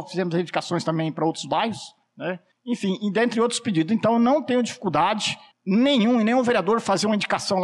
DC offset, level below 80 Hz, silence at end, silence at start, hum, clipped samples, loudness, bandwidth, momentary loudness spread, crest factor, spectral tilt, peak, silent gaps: under 0.1%; -66 dBFS; 0 s; 0 s; none; under 0.1%; -23 LUFS; 11.5 kHz; 12 LU; 10 dB; -5 dB/octave; -12 dBFS; none